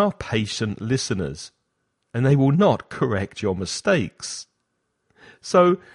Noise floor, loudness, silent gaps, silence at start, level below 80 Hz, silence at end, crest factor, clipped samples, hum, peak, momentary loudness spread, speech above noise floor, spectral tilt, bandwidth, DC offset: -74 dBFS; -22 LUFS; none; 0 s; -52 dBFS; 0.2 s; 18 dB; under 0.1%; none; -4 dBFS; 15 LU; 53 dB; -5.5 dB/octave; 11.5 kHz; under 0.1%